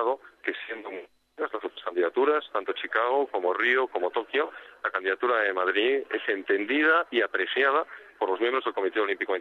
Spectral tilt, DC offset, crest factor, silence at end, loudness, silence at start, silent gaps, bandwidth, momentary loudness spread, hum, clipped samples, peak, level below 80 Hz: -4 dB/octave; under 0.1%; 18 dB; 0 s; -26 LUFS; 0 s; none; 4.7 kHz; 10 LU; none; under 0.1%; -10 dBFS; -78 dBFS